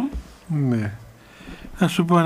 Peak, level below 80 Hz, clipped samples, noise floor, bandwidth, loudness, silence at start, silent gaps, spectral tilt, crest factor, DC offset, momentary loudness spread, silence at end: -6 dBFS; -42 dBFS; under 0.1%; -42 dBFS; 15.5 kHz; -23 LUFS; 0 s; none; -7 dB/octave; 18 dB; under 0.1%; 21 LU; 0 s